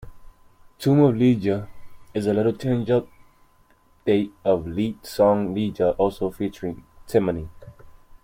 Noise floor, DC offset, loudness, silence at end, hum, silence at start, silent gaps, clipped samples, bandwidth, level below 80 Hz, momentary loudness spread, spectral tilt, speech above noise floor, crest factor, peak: -58 dBFS; under 0.1%; -23 LUFS; 0.3 s; none; 0 s; none; under 0.1%; 16.5 kHz; -50 dBFS; 14 LU; -8 dB/octave; 36 dB; 18 dB; -6 dBFS